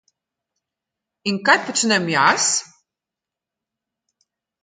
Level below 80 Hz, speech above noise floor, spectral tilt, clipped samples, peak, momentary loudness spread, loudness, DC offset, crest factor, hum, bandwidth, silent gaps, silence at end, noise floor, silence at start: -70 dBFS; 69 dB; -2 dB/octave; under 0.1%; 0 dBFS; 9 LU; -18 LUFS; under 0.1%; 22 dB; none; 9.6 kHz; none; 2 s; -87 dBFS; 1.25 s